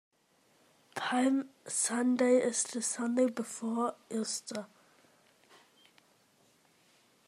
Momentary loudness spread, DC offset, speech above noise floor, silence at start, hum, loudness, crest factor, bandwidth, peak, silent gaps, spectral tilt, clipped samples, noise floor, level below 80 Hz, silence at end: 12 LU; under 0.1%; 38 dB; 0.95 s; none; -32 LUFS; 18 dB; 14 kHz; -16 dBFS; none; -2.5 dB/octave; under 0.1%; -69 dBFS; -90 dBFS; 2.6 s